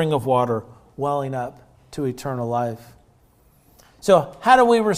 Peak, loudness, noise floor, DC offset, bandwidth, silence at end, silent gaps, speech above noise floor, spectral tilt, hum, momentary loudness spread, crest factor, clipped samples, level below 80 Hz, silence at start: -2 dBFS; -21 LUFS; -56 dBFS; under 0.1%; 16 kHz; 0 s; none; 37 dB; -6 dB/octave; none; 15 LU; 20 dB; under 0.1%; -56 dBFS; 0 s